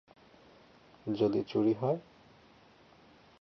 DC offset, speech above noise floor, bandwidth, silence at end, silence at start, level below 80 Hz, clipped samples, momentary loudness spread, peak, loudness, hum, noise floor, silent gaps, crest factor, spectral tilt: under 0.1%; 30 dB; 6.2 kHz; 1.4 s; 1.05 s; -72 dBFS; under 0.1%; 9 LU; -18 dBFS; -32 LUFS; none; -61 dBFS; none; 18 dB; -9 dB/octave